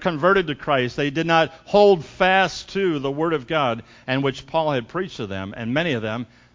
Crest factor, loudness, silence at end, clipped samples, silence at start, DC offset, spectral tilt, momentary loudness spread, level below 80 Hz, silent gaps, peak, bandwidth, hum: 18 dB; -21 LUFS; 0.3 s; under 0.1%; 0 s; under 0.1%; -6 dB/octave; 12 LU; -52 dBFS; none; -2 dBFS; 7.6 kHz; none